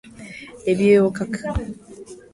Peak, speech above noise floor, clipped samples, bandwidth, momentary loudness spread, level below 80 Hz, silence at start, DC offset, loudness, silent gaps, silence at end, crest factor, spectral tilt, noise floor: -4 dBFS; 23 dB; under 0.1%; 11.5 kHz; 23 LU; -38 dBFS; 0.05 s; under 0.1%; -20 LUFS; none; 0.2 s; 18 dB; -7 dB/octave; -41 dBFS